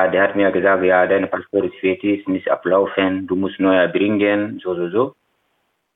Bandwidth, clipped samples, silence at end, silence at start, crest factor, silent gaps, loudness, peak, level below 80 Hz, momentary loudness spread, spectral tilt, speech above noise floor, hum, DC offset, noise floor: 4 kHz; under 0.1%; 0.85 s; 0 s; 16 dB; none; -18 LUFS; -2 dBFS; -66 dBFS; 6 LU; -9 dB/octave; 51 dB; none; under 0.1%; -68 dBFS